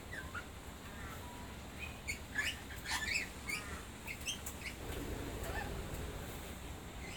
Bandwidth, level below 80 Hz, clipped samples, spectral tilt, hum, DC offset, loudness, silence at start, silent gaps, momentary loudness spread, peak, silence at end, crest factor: 19 kHz; -52 dBFS; under 0.1%; -3 dB/octave; none; under 0.1%; -43 LUFS; 0 s; none; 10 LU; -24 dBFS; 0 s; 18 dB